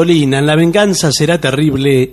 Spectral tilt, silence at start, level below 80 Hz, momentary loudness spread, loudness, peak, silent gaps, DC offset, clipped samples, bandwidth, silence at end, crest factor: -5 dB/octave; 0 s; -40 dBFS; 2 LU; -11 LUFS; 0 dBFS; none; under 0.1%; under 0.1%; 13 kHz; 0 s; 10 dB